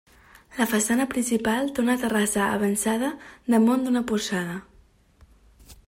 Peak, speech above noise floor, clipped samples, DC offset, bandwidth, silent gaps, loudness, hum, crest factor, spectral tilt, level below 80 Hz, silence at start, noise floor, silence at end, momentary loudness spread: -8 dBFS; 33 dB; under 0.1%; under 0.1%; 16.5 kHz; none; -24 LUFS; none; 16 dB; -4 dB/octave; -56 dBFS; 0.5 s; -57 dBFS; 0.15 s; 9 LU